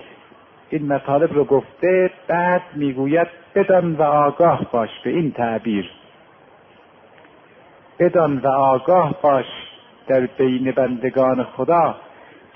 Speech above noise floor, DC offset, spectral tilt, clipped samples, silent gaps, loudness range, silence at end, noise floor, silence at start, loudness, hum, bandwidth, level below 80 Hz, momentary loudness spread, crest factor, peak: 31 dB; under 0.1%; -10 dB/octave; under 0.1%; none; 6 LU; 0.55 s; -49 dBFS; 0.7 s; -18 LUFS; none; 3.6 kHz; -58 dBFS; 7 LU; 16 dB; -4 dBFS